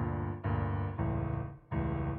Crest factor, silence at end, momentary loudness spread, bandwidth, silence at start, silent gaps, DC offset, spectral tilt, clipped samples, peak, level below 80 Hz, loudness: 12 dB; 0 s; 4 LU; 3.6 kHz; 0 s; none; under 0.1%; -9 dB/octave; under 0.1%; -22 dBFS; -44 dBFS; -35 LUFS